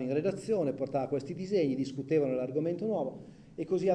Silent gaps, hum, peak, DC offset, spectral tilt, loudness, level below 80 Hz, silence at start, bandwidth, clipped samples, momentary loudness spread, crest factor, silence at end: none; none; -16 dBFS; under 0.1%; -7.5 dB/octave; -32 LUFS; -68 dBFS; 0 s; 10 kHz; under 0.1%; 8 LU; 14 dB; 0 s